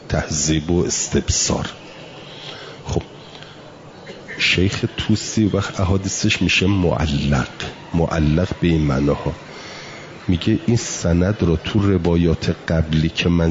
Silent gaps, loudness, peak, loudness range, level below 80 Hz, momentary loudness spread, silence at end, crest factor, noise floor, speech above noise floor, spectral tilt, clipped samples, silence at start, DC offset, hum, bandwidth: none; -19 LUFS; -4 dBFS; 5 LU; -36 dBFS; 19 LU; 0 s; 14 dB; -39 dBFS; 21 dB; -5 dB/octave; under 0.1%; 0 s; under 0.1%; none; 7.8 kHz